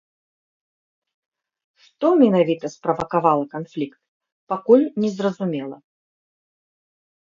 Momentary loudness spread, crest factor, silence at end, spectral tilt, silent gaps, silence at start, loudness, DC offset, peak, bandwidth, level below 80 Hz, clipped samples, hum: 14 LU; 22 dB; 1.6 s; -7.5 dB/octave; 4.08-4.20 s, 4.32-4.47 s; 2 s; -20 LUFS; under 0.1%; -2 dBFS; 7.4 kHz; -64 dBFS; under 0.1%; none